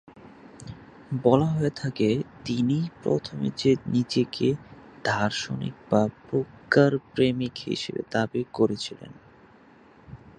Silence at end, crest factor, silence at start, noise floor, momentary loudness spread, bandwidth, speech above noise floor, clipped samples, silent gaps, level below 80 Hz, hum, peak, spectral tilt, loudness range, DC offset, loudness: 0.2 s; 22 dB; 0.15 s; -54 dBFS; 13 LU; 9.8 kHz; 29 dB; under 0.1%; none; -58 dBFS; none; -4 dBFS; -6.5 dB/octave; 2 LU; under 0.1%; -26 LUFS